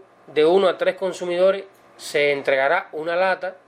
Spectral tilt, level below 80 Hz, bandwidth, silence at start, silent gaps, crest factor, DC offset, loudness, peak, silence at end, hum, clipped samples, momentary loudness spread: -4.5 dB/octave; -74 dBFS; 15.5 kHz; 0.3 s; none; 14 dB; under 0.1%; -20 LUFS; -6 dBFS; 0.15 s; none; under 0.1%; 9 LU